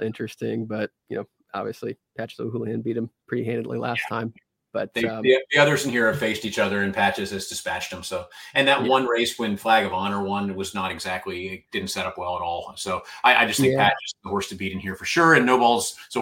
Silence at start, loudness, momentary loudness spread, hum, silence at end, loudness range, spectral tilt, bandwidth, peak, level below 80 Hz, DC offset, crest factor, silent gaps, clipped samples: 0 s; -23 LUFS; 14 LU; none; 0 s; 9 LU; -4 dB/octave; 17 kHz; -2 dBFS; -60 dBFS; under 0.1%; 22 dB; none; under 0.1%